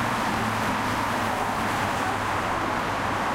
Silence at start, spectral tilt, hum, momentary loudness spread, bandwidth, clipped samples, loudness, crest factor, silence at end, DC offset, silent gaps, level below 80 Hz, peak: 0 s; -4.5 dB/octave; none; 1 LU; 16 kHz; under 0.1%; -25 LUFS; 14 dB; 0 s; under 0.1%; none; -46 dBFS; -12 dBFS